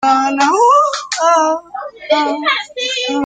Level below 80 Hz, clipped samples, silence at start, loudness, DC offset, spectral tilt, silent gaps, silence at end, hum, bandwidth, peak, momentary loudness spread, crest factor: -64 dBFS; under 0.1%; 0 s; -14 LUFS; under 0.1%; -1 dB/octave; none; 0 s; none; 9.6 kHz; 0 dBFS; 9 LU; 14 dB